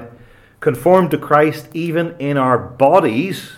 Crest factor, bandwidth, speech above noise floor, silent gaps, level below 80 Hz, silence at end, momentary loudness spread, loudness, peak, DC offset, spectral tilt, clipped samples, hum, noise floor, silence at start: 16 dB; 16 kHz; 29 dB; none; -54 dBFS; 0 s; 8 LU; -15 LUFS; 0 dBFS; under 0.1%; -7 dB/octave; under 0.1%; none; -44 dBFS; 0 s